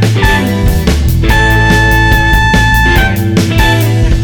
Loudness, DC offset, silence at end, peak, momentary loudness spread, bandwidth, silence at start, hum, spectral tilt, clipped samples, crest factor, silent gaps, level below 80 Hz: -9 LUFS; under 0.1%; 0 s; 0 dBFS; 4 LU; 19.5 kHz; 0 s; none; -5.5 dB/octave; under 0.1%; 8 dB; none; -12 dBFS